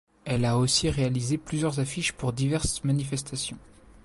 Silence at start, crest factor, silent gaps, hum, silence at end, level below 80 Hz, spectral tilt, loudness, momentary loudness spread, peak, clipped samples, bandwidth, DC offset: 0.25 s; 16 dB; none; none; 0.45 s; -46 dBFS; -4.5 dB/octave; -27 LUFS; 9 LU; -12 dBFS; under 0.1%; 11.5 kHz; under 0.1%